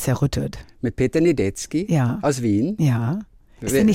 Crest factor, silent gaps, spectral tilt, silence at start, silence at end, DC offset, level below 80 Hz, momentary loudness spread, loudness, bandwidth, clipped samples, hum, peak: 12 dB; none; -6.5 dB/octave; 0 s; 0 s; under 0.1%; -42 dBFS; 10 LU; -22 LUFS; 16 kHz; under 0.1%; none; -8 dBFS